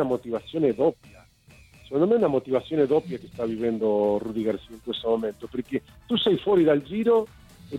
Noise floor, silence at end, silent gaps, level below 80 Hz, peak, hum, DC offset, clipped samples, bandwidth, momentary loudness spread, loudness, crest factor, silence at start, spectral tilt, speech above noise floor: -54 dBFS; 0 s; none; -56 dBFS; -10 dBFS; none; under 0.1%; under 0.1%; 12 kHz; 11 LU; -25 LUFS; 16 dB; 0 s; -7.5 dB/octave; 29 dB